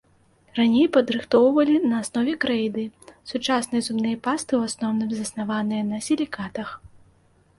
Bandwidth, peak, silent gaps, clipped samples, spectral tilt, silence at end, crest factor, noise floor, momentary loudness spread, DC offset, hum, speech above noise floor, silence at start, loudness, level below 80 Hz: 11.5 kHz; -6 dBFS; none; under 0.1%; -4.5 dB/octave; 0.7 s; 18 dB; -59 dBFS; 14 LU; under 0.1%; none; 37 dB; 0.55 s; -23 LUFS; -60 dBFS